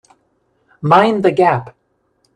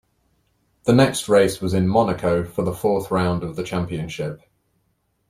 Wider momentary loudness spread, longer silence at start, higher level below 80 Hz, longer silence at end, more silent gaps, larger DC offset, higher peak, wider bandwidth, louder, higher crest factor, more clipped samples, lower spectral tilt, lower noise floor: about the same, 11 LU vs 11 LU; about the same, 0.85 s vs 0.85 s; second, -58 dBFS vs -50 dBFS; second, 0.65 s vs 0.95 s; neither; neither; about the same, 0 dBFS vs -2 dBFS; second, 10.5 kHz vs 15.5 kHz; first, -14 LUFS vs -21 LUFS; about the same, 16 dB vs 18 dB; neither; first, -7.5 dB/octave vs -6 dB/octave; second, -63 dBFS vs -69 dBFS